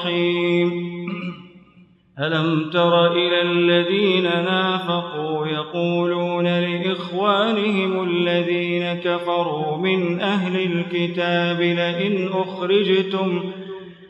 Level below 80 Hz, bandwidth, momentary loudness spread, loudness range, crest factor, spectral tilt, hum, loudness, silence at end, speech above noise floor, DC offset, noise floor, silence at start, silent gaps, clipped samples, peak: -70 dBFS; 8 kHz; 7 LU; 3 LU; 16 dB; -7.5 dB/octave; none; -20 LUFS; 0 s; 32 dB; under 0.1%; -52 dBFS; 0 s; none; under 0.1%; -6 dBFS